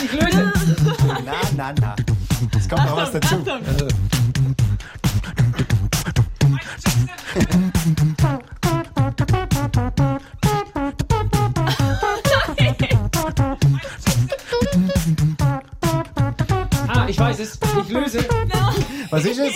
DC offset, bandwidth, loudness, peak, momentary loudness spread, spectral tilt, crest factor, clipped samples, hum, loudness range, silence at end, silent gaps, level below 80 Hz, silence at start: under 0.1%; 16.5 kHz; -20 LUFS; -4 dBFS; 4 LU; -5.5 dB/octave; 14 dB; under 0.1%; none; 1 LU; 0 s; none; -30 dBFS; 0 s